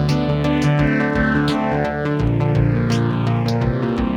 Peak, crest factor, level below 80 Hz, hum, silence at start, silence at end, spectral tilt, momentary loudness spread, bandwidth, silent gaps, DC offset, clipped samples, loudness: -4 dBFS; 12 dB; -32 dBFS; none; 0 s; 0 s; -7.5 dB/octave; 3 LU; 11 kHz; none; under 0.1%; under 0.1%; -18 LUFS